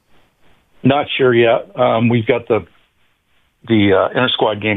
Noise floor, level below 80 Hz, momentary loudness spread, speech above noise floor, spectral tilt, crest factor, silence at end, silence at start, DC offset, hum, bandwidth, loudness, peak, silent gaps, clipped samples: -60 dBFS; -54 dBFS; 5 LU; 46 dB; -9 dB/octave; 14 dB; 0 s; 0.85 s; 0.1%; none; 4.1 kHz; -15 LUFS; -2 dBFS; none; under 0.1%